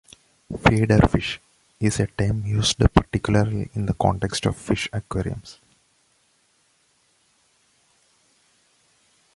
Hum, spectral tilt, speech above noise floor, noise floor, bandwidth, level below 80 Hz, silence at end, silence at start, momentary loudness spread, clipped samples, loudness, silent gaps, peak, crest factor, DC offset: none; -5.5 dB/octave; 43 dB; -64 dBFS; 11.5 kHz; -36 dBFS; 3.85 s; 0.5 s; 11 LU; under 0.1%; -22 LUFS; none; -2 dBFS; 22 dB; under 0.1%